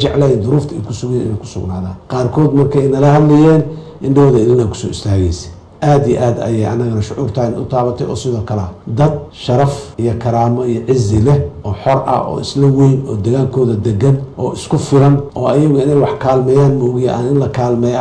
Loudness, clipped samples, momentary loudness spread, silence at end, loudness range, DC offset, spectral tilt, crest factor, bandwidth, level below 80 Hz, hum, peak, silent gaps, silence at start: -13 LUFS; under 0.1%; 11 LU; 0 s; 5 LU; under 0.1%; -8 dB/octave; 10 dB; 9.6 kHz; -36 dBFS; none; -2 dBFS; none; 0 s